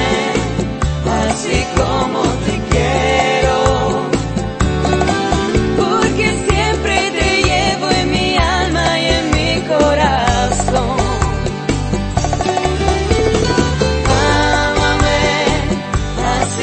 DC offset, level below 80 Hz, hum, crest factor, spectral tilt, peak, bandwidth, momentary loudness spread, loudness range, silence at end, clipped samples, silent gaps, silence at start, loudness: under 0.1%; -24 dBFS; none; 14 dB; -4.5 dB/octave; 0 dBFS; 8.8 kHz; 5 LU; 2 LU; 0 s; under 0.1%; none; 0 s; -15 LUFS